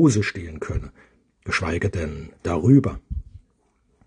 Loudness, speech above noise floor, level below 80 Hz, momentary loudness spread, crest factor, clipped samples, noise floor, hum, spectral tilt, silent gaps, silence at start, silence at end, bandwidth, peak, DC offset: -23 LUFS; 44 dB; -40 dBFS; 19 LU; 20 dB; under 0.1%; -65 dBFS; none; -6.5 dB/octave; none; 0 s; 0.7 s; 10 kHz; -4 dBFS; under 0.1%